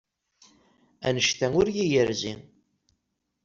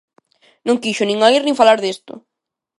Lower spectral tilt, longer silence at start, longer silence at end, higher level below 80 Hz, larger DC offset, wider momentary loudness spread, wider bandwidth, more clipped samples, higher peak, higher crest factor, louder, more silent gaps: about the same, -4 dB/octave vs -3.5 dB/octave; first, 1 s vs 0.65 s; first, 1.05 s vs 0.6 s; first, -56 dBFS vs -68 dBFS; neither; about the same, 10 LU vs 12 LU; second, 7.6 kHz vs 11.5 kHz; neither; second, -8 dBFS vs 0 dBFS; about the same, 20 dB vs 18 dB; second, -25 LUFS vs -15 LUFS; neither